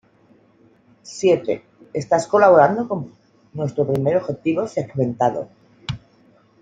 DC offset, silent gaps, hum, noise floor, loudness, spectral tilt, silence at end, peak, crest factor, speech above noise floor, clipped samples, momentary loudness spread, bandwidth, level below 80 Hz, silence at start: under 0.1%; none; none; -55 dBFS; -19 LUFS; -6.5 dB/octave; 0.65 s; -2 dBFS; 18 dB; 36 dB; under 0.1%; 21 LU; 9.4 kHz; -56 dBFS; 1.05 s